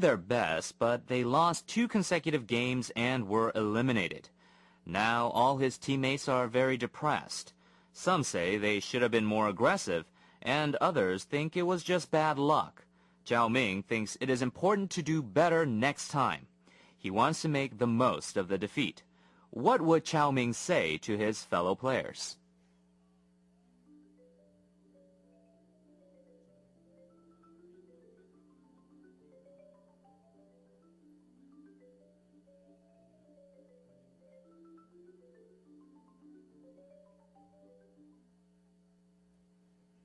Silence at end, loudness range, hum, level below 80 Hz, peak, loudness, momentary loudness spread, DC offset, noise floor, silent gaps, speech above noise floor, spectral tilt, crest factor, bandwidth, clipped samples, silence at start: 17.7 s; 2 LU; none; -72 dBFS; -14 dBFS; -31 LUFS; 8 LU; under 0.1%; -67 dBFS; none; 37 dB; -5 dB/octave; 20 dB; 12 kHz; under 0.1%; 0 s